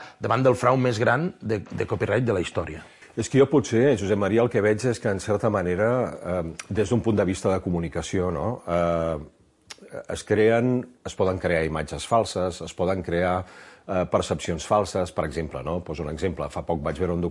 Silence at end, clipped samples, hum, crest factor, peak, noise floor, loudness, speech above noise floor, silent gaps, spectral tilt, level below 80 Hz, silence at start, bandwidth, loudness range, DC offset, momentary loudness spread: 0 s; under 0.1%; none; 18 dB; -6 dBFS; -48 dBFS; -24 LUFS; 24 dB; none; -6 dB/octave; -50 dBFS; 0 s; 11.5 kHz; 4 LU; under 0.1%; 10 LU